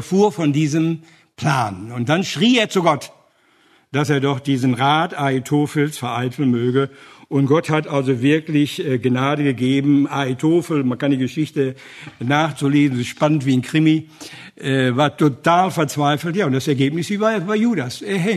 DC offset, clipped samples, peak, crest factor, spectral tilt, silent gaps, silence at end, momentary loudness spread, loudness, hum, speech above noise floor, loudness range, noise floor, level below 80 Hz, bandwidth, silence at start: under 0.1%; under 0.1%; -2 dBFS; 18 dB; -6 dB/octave; none; 0 s; 7 LU; -18 LUFS; none; 38 dB; 2 LU; -56 dBFS; -62 dBFS; 13.5 kHz; 0 s